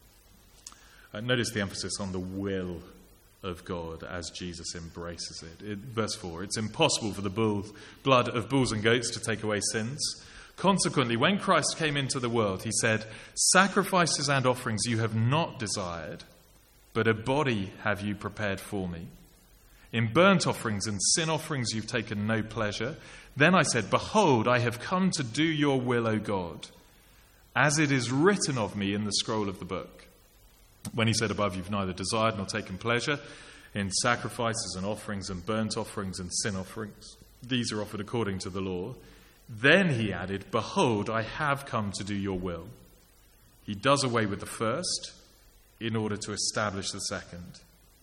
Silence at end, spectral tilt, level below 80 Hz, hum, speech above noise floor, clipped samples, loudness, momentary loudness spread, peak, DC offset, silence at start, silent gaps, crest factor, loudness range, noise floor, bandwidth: 0.45 s; -4 dB/octave; -58 dBFS; none; 30 dB; under 0.1%; -28 LUFS; 15 LU; -6 dBFS; under 0.1%; 0.65 s; none; 24 dB; 8 LU; -59 dBFS; 16.5 kHz